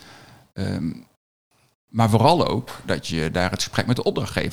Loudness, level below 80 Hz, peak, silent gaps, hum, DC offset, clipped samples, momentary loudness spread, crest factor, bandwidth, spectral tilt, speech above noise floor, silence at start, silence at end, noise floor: -22 LUFS; -48 dBFS; -2 dBFS; 1.16-1.51 s, 1.75-1.88 s; none; 0.6%; under 0.1%; 14 LU; 20 dB; 16 kHz; -5.5 dB/octave; 26 dB; 0 s; 0 s; -48 dBFS